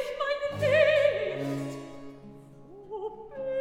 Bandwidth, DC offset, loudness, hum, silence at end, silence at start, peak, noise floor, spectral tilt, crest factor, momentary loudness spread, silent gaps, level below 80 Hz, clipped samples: 14.5 kHz; under 0.1%; -27 LUFS; none; 0 s; 0 s; -12 dBFS; -49 dBFS; -5.5 dB/octave; 18 dB; 23 LU; none; -62 dBFS; under 0.1%